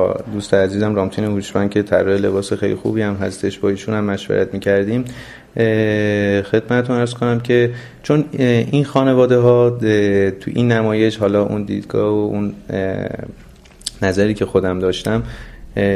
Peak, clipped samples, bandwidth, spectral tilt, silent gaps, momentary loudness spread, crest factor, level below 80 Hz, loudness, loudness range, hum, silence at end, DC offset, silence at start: 0 dBFS; under 0.1%; 13 kHz; -7 dB/octave; none; 8 LU; 16 dB; -42 dBFS; -17 LUFS; 5 LU; none; 0 s; under 0.1%; 0 s